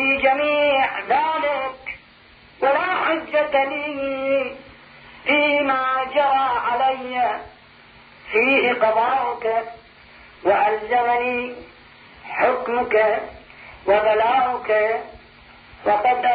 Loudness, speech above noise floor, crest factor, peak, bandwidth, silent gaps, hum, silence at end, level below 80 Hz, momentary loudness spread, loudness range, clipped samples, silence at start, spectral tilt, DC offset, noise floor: -20 LUFS; 30 dB; 16 dB; -6 dBFS; 5 kHz; none; none; 0 s; -56 dBFS; 12 LU; 2 LU; under 0.1%; 0 s; -6.5 dB/octave; under 0.1%; -49 dBFS